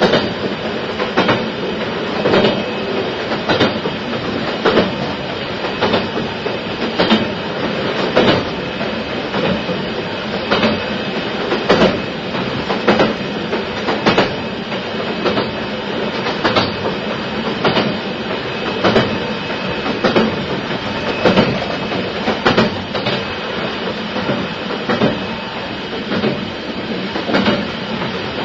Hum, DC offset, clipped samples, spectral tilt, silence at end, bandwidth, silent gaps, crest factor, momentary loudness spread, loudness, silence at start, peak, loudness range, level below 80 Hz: none; under 0.1%; under 0.1%; -6 dB/octave; 0 s; 7.8 kHz; none; 18 dB; 7 LU; -18 LUFS; 0 s; 0 dBFS; 3 LU; -44 dBFS